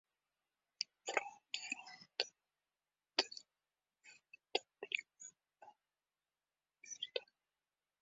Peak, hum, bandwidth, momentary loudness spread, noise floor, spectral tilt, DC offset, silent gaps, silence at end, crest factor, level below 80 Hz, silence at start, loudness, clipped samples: -14 dBFS; 50 Hz at -100 dBFS; 8 kHz; 19 LU; under -90 dBFS; 3 dB/octave; under 0.1%; none; 0.75 s; 34 dB; under -90 dBFS; 0.8 s; -43 LUFS; under 0.1%